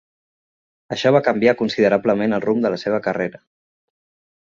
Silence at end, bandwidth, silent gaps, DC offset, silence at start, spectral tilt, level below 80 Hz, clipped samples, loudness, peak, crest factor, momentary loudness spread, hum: 1.1 s; 7.4 kHz; none; under 0.1%; 0.9 s; -6.5 dB/octave; -60 dBFS; under 0.1%; -19 LUFS; -2 dBFS; 18 dB; 8 LU; none